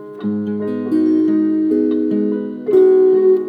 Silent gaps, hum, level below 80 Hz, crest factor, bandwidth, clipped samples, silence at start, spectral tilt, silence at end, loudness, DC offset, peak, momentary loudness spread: none; none; -72 dBFS; 12 dB; 4.7 kHz; under 0.1%; 0 s; -10 dB/octave; 0 s; -15 LUFS; under 0.1%; -2 dBFS; 10 LU